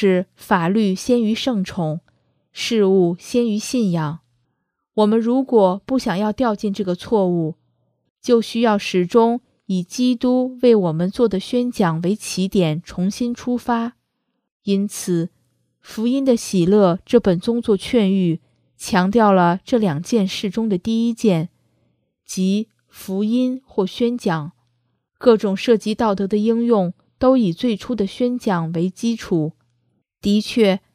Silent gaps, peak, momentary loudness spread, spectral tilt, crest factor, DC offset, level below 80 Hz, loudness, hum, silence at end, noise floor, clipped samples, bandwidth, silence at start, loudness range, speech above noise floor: 8.10-8.16 s, 14.51-14.60 s; 0 dBFS; 9 LU; -6 dB/octave; 18 dB; under 0.1%; -52 dBFS; -19 LUFS; none; 0.15 s; -73 dBFS; under 0.1%; 15.5 kHz; 0 s; 4 LU; 55 dB